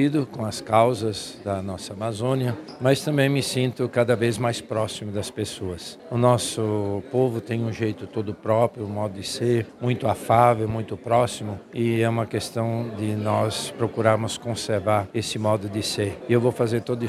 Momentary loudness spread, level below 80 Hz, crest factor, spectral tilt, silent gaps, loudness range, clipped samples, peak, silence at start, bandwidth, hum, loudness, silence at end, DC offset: 9 LU; -58 dBFS; 22 dB; -5.5 dB/octave; none; 2 LU; under 0.1%; -2 dBFS; 0 s; 14.5 kHz; none; -24 LUFS; 0 s; under 0.1%